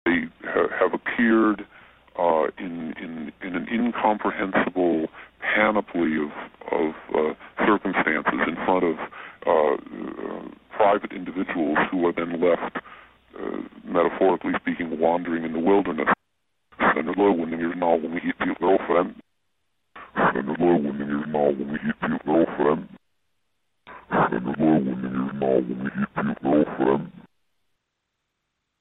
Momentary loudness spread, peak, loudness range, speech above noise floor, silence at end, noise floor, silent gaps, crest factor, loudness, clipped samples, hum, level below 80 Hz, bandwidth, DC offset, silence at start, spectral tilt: 12 LU; -4 dBFS; 2 LU; 56 dB; 1.6 s; -79 dBFS; none; 20 dB; -24 LUFS; under 0.1%; none; -58 dBFS; 4 kHz; under 0.1%; 0.05 s; -9.5 dB/octave